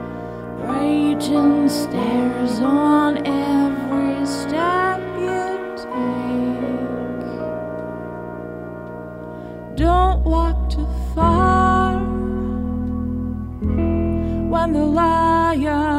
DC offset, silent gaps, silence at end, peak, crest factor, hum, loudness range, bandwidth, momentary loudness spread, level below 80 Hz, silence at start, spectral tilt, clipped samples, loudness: under 0.1%; none; 0 s; -4 dBFS; 16 dB; none; 7 LU; 15 kHz; 15 LU; -28 dBFS; 0 s; -7 dB/octave; under 0.1%; -20 LUFS